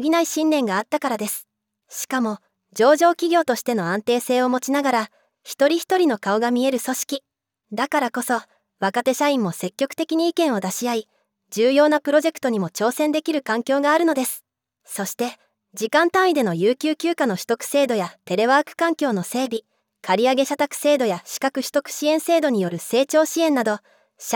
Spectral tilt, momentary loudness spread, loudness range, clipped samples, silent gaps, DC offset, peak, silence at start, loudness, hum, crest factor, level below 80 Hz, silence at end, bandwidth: -4 dB/octave; 10 LU; 3 LU; under 0.1%; none; under 0.1%; -4 dBFS; 0 s; -21 LUFS; none; 18 dB; -78 dBFS; 0 s; over 20 kHz